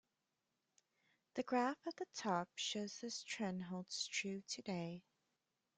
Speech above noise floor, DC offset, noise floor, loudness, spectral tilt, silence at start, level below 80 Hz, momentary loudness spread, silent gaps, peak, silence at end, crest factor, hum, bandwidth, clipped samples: 45 dB; under 0.1%; -89 dBFS; -44 LUFS; -3.5 dB/octave; 1.35 s; -86 dBFS; 8 LU; none; -26 dBFS; 0.8 s; 20 dB; none; 9.6 kHz; under 0.1%